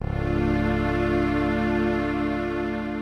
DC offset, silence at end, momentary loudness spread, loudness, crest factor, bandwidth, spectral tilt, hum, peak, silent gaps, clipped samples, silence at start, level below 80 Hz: under 0.1%; 0 s; 4 LU; -24 LUFS; 14 dB; 11.5 kHz; -8 dB/octave; none; -10 dBFS; none; under 0.1%; 0 s; -34 dBFS